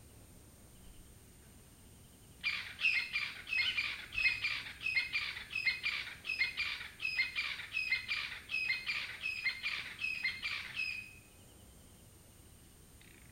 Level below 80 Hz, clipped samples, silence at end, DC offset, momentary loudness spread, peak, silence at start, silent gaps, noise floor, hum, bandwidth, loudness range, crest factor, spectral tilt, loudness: -64 dBFS; under 0.1%; 0 s; under 0.1%; 7 LU; -18 dBFS; 0 s; none; -59 dBFS; none; 16 kHz; 5 LU; 22 dB; -1 dB/octave; -35 LUFS